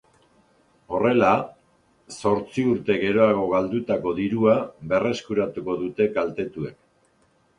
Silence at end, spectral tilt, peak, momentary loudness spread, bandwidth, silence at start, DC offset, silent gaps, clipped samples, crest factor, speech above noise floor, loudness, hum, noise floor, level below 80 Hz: 0.85 s; -6.5 dB/octave; -4 dBFS; 11 LU; 10.5 kHz; 0.9 s; under 0.1%; none; under 0.1%; 20 dB; 41 dB; -23 LUFS; none; -63 dBFS; -58 dBFS